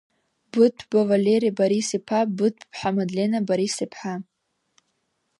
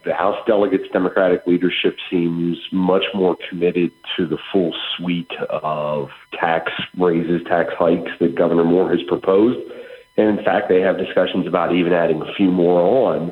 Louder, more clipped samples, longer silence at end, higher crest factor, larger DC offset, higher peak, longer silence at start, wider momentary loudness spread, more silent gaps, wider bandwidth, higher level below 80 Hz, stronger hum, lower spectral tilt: second, -23 LUFS vs -18 LUFS; neither; first, 1.2 s vs 0 s; about the same, 18 dB vs 16 dB; neither; second, -6 dBFS vs 0 dBFS; first, 0.55 s vs 0.05 s; about the same, 10 LU vs 8 LU; neither; first, 11.5 kHz vs 5.2 kHz; second, -68 dBFS vs -56 dBFS; neither; second, -5.5 dB/octave vs -8.5 dB/octave